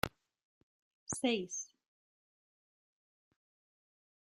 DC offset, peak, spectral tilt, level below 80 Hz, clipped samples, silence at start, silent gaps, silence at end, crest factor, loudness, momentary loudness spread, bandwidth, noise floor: under 0.1%; -14 dBFS; -3 dB/octave; -70 dBFS; under 0.1%; 0.05 s; 0.43-1.07 s; 2.6 s; 32 dB; -38 LUFS; 16 LU; 13 kHz; under -90 dBFS